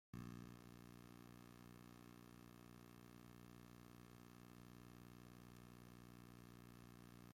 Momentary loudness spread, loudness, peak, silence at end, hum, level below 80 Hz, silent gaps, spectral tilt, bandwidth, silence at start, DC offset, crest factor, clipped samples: 4 LU; -62 LUFS; -44 dBFS; 0 s; 60 Hz at -65 dBFS; -74 dBFS; none; -5.5 dB/octave; 16.5 kHz; 0.15 s; under 0.1%; 18 dB; under 0.1%